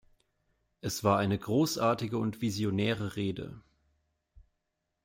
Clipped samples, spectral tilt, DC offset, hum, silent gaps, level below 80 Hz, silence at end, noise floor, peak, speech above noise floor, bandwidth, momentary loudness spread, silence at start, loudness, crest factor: under 0.1%; -5.5 dB/octave; under 0.1%; none; none; -64 dBFS; 0.65 s; -83 dBFS; -12 dBFS; 53 dB; 16.5 kHz; 10 LU; 0.85 s; -31 LUFS; 20 dB